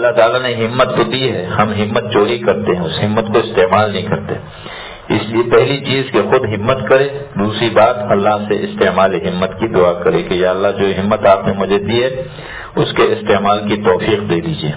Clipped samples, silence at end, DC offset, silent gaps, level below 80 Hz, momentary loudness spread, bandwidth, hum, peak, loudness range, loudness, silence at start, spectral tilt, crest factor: under 0.1%; 0 s; under 0.1%; none; -40 dBFS; 7 LU; 4 kHz; none; 0 dBFS; 2 LU; -14 LUFS; 0 s; -10 dB/octave; 14 dB